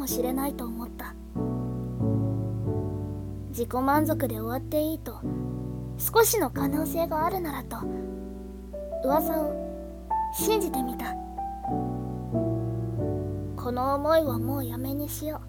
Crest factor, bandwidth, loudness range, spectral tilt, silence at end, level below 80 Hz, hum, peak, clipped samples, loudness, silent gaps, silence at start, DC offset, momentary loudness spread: 20 dB; 18 kHz; 4 LU; -6 dB/octave; 0 s; -44 dBFS; none; -8 dBFS; under 0.1%; -29 LUFS; none; 0 s; under 0.1%; 12 LU